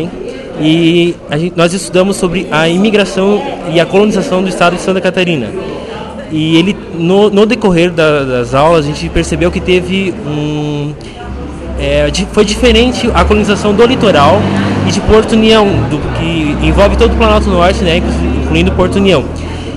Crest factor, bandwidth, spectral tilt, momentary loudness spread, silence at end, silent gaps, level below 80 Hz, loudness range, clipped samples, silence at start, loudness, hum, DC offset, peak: 10 dB; 12.5 kHz; -5.5 dB/octave; 11 LU; 0 s; none; -22 dBFS; 4 LU; 0.1%; 0 s; -10 LUFS; none; 0.2%; 0 dBFS